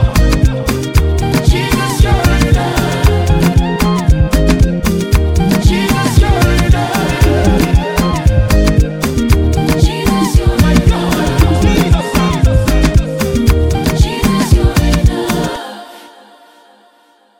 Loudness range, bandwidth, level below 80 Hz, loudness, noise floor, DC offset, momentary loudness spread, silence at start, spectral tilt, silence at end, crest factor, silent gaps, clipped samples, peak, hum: 1 LU; 17 kHz; -14 dBFS; -12 LUFS; -50 dBFS; under 0.1%; 3 LU; 0 s; -6 dB/octave; 1.3 s; 10 dB; none; under 0.1%; 0 dBFS; none